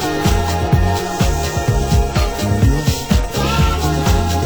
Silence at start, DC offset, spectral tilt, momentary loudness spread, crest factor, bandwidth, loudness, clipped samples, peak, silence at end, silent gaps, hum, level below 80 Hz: 0 s; under 0.1%; -5.5 dB/octave; 3 LU; 14 dB; over 20 kHz; -17 LUFS; under 0.1%; -2 dBFS; 0 s; none; none; -20 dBFS